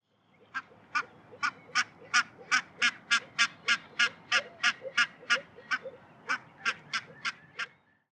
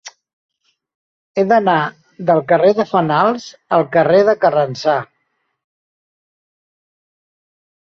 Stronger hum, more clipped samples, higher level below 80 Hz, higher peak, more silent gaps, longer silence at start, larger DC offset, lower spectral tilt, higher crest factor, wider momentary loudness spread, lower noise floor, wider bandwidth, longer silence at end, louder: neither; neither; second, -84 dBFS vs -62 dBFS; second, -12 dBFS vs -2 dBFS; second, none vs 0.33-0.49 s, 0.95-1.35 s; first, 0.55 s vs 0.05 s; neither; second, 0.5 dB/octave vs -6.5 dB/octave; first, 22 dB vs 16 dB; first, 14 LU vs 9 LU; second, -65 dBFS vs -69 dBFS; first, 11 kHz vs 7.2 kHz; second, 0.45 s vs 2.9 s; second, -30 LUFS vs -15 LUFS